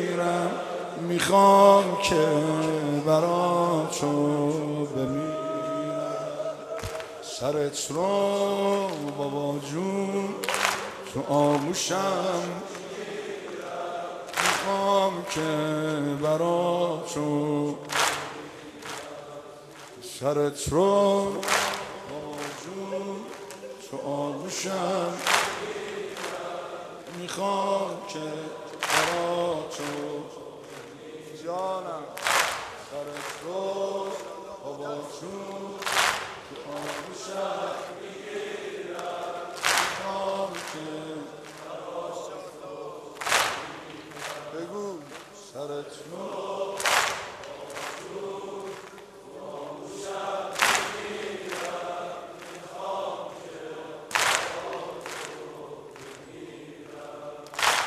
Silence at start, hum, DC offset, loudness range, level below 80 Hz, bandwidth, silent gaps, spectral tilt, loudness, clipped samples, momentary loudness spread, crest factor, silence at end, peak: 0 s; none; under 0.1%; 6 LU; -62 dBFS; 14 kHz; none; -3.5 dB/octave; -27 LUFS; under 0.1%; 17 LU; 26 dB; 0 s; -2 dBFS